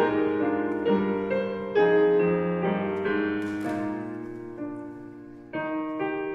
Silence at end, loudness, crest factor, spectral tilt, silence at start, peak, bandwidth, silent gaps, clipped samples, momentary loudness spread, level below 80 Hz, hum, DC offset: 0 s; -27 LUFS; 16 dB; -8 dB/octave; 0 s; -12 dBFS; 7.4 kHz; none; under 0.1%; 15 LU; -64 dBFS; none; under 0.1%